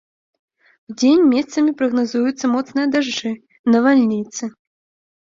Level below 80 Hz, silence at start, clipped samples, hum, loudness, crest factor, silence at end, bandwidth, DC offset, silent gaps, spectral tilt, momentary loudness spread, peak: -64 dBFS; 0.9 s; under 0.1%; none; -17 LUFS; 16 dB; 0.9 s; 7.6 kHz; under 0.1%; 3.59-3.64 s; -4.5 dB/octave; 14 LU; -4 dBFS